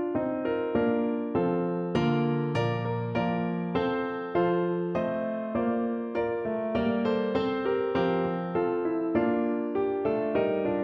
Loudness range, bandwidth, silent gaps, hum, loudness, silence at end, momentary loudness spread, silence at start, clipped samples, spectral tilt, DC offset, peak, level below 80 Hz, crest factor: 1 LU; 6.6 kHz; none; none; -28 LUFS; 0 s; 3 LU; 0 s; under 0.1%; -8.5 dB/octave; under 0.1%; -14 dBFS; -58 dBFS; 14 dB